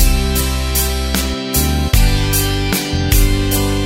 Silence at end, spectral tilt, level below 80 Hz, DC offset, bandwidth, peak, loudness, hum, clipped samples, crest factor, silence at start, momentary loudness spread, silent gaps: 0 s; -4 dB/octave; -18 dBFS; under 0.1%; 16.5 kHz; 0 dBFS; -16 LUFS; none; under 0.1%; 14 dB; 0 s; 3 LU; none